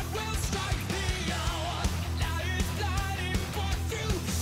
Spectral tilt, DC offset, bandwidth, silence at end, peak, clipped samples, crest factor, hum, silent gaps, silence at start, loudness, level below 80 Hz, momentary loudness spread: -4 dB/octave; under 0.1%; 16 kHz; 0 s; -18 dBFS; under 0.1%; 12 dB; none; none; 0 s; -31 LUFS; -36 dBFS; 1 LU